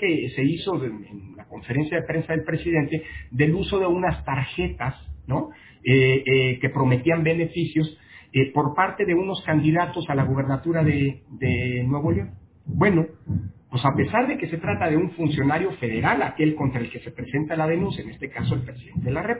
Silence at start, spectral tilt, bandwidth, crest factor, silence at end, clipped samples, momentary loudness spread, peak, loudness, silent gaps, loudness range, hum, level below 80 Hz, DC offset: 0 s; -11 dB/octave; 4 kHz; 18 dB; 0 s; under 0.1%; 10 LU; -6 dBFS; -23 LUFS; none; 3 LU; none; -44 dBFS; under 0.1%